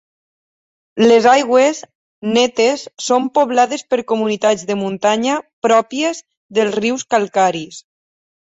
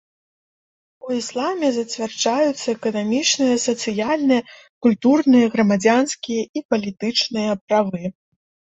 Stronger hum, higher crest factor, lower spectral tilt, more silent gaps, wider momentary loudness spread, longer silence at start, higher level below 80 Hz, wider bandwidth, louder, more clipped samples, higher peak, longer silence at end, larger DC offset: neither; about the same, 14 dB vs 18 dB; about the same, -3.5 dB/octave vs -4 dB/octave; first, 1.95-2.22 s, 5.53-5.62 s, 6.37-6.49 s vs 4.69-4.81 s, 6.49-6.54 s, 6.65-6.69 s, 7.61-7.68 s; about the same, 10 LU vs 9 LU; about the same, 0.95 s vs 1.05 s; about the same, -64 dBFS vs -64 dBFS; about the same, 8 kHz vs 8.2 kHz; first, -15 LUFS vs -19 LUFS; neither; about the same, -2 dBFS vs -2 dBFS; about the same, 0.7 s vs 0.65 s; neither